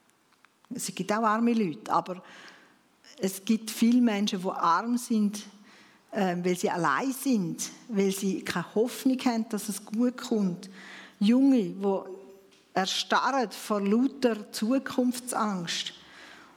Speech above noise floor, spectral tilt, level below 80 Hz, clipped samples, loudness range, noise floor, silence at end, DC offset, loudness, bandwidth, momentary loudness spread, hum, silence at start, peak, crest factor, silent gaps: 37 dB; -4.5 dB/octave; -80 dBFS; under 0.1%; 2 LU; -64 dBFS; 0.15 s; under 0.1%; -28 LUFS; 17 kHz; 16 LU; none; 0.7 s; -10 dBFS; 18 dB; none